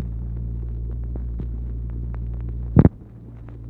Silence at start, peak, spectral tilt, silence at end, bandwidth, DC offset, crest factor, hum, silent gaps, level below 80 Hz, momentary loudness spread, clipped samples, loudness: 0 s; 0 dBFS; -13 dB/octave; 0 s; 2.7 kHz; under 0.1%; 24 dB; none; none; -28 dBFS; 21 LU; under 0.1%; -25 LUFS